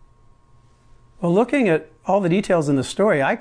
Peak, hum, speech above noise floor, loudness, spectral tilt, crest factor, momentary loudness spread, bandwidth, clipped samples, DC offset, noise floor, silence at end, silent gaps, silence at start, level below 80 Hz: -6 dBFS; none; 34 dB; -20 LUFS; -6.5 dB/octave; 14 dB; 4 LU; 10.5 kHz; under 0.1%; under 0.1%; -53 dBFS; 0 s; none; 1.2 s; -54 dBFS